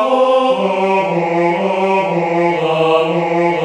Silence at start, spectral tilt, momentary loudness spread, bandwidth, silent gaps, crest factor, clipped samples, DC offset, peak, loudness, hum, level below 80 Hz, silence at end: 0 s; -6.5 dB/octave; 3 LU; 10 kHz; none; 12 dB; under 0.1%; under 0.1%; -2 dBFS; -14 LUFS; none; -60 dBFS; 0 s